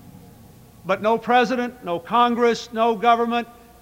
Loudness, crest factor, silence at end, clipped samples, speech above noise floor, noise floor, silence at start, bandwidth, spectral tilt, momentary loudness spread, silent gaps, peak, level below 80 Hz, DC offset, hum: -20 LUFS; 18 dB; 0.3 s; under 0.1%; 27 dB; -47 dBFS; 0.05 s; 16 kHz; -5 dB/octave; 9 LU; none; -4 dBFS; -58 dBFS; under 0.1%; none